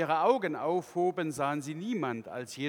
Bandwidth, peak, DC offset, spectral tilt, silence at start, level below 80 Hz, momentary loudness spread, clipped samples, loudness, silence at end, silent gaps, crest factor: 18 kHz; -12 dBFS; under 0.1%; -5.5 dB/octave; 0 s; -78 dBFS; 9 LU; under 0.1%; -31 LUFS; 0 s; none; 20 dB